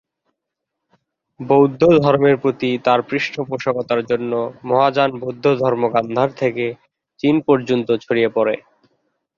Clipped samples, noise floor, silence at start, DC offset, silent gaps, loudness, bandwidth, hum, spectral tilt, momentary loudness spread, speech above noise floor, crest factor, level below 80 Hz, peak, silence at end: under 0.1%; -80 dBFS; 1.4 s; under 0.1%; none; -18 LUFS; 7.2 kHz; none; -7.5 dB/octave; 9 LU; 63 dB; 16 dB; -58 dBFS; -2 dBFS; 0.8 s